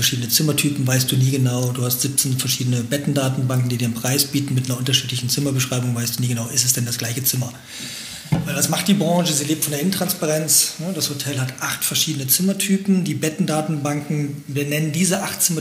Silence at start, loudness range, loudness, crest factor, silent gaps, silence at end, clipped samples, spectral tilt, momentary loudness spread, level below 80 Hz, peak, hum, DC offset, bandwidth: 0 s; 2 LU; -19 LUFS; 18 dB; none; 0 s; under 0.1%; -4 dB/octave; 7 LU; -56 dBFS; -2 dBFS; none; under 0.1%; 16.5 kHz